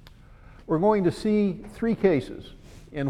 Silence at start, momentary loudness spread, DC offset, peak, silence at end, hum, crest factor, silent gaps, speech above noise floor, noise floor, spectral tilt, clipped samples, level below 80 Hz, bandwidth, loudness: 0.7 s; 17 LU; under 0.1%; -8 dBFS; 0 s; none; 18 dB; none; 25 dB; -49 dBFS; -8 dB/octave; under 0.1%; -48 dBFS; 11.5 kHz; -24 LUFS